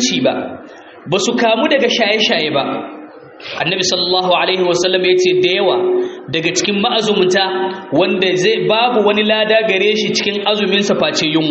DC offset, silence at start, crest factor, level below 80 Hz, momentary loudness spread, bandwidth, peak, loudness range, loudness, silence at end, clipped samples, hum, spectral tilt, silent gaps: under 0.1%; 0 s; 14 dB; -58 dBFS; 8 LU; 8 kHz; 0 dBFS; 2 LU; -14 LUFS; 0 s; under 0.1%; none; -2 dB/octave; none